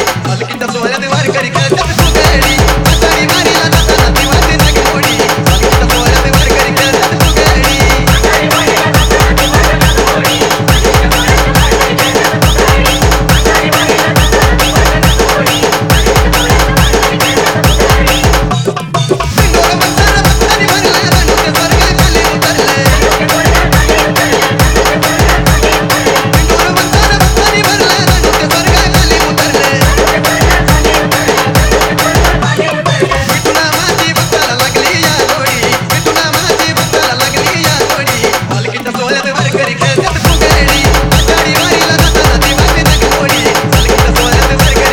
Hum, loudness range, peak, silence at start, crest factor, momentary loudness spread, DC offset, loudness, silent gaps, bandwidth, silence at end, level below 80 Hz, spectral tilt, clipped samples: none; 2 LU; 0 dBFS; 0 s; 8 dB; 3 LU; 0.3%; -8 LUFS; none; over 20 kHz; 0 s; -16 dBFS; -4 dB/octave; 0.8%